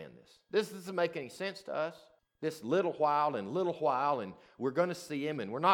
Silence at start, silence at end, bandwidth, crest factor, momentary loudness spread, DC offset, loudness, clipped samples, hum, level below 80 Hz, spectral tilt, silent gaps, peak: 0 s; 0 s; 18 kHz; 20 dB; 10 LU; under 0.1%; -34 LUFS; under 0.1%; none; -82 dBFS; -5.5 dB/octave; none; -14 dBFS